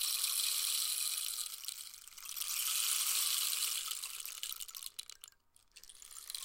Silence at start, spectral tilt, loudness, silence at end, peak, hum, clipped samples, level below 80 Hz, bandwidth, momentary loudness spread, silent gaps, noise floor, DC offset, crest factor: 0 s; 5.5 dB/octave; -35 LUFS; 0 s; -18 dBFS; none; under 0.1%; -76 dBFS; 17 kHz; 17 LU; none; -65 dBFS; under 0.1%; 22 dB